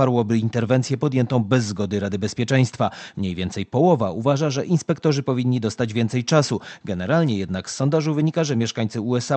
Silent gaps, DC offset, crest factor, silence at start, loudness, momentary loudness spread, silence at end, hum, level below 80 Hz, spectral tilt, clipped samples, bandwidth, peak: none; under 0.1%; 18 dB; 0 s; -22 LUFS; 6 LU; 0 s; none; -50 dBFS; -6.5 dB/octave; under 0.1%; 8.8 kHz; -2 dBFS